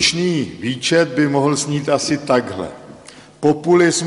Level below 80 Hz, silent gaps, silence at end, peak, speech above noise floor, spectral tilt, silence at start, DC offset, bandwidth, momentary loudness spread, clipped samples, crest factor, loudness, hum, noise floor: -54 dBFS; none; 0 s; -2 dBFS; 24 dB; -4 dB/octave; 0 s; under 0.1%; 11.5 kHz; 12 LU; under 0.1%; 14 dB; -17 LUFS; none; -41 dBFS